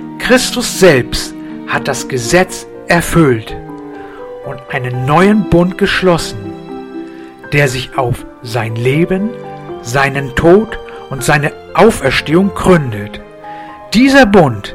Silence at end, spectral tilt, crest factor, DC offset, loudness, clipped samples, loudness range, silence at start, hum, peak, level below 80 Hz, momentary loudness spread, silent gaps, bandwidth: 0 s; -5 dB/octave; 12 dB; under 0.1%; -12 LUFS; 0.6%; 4 LU; 0 s; none; 0 dBFS; -32 dBFS; 18 LU; none; 16.5 kHz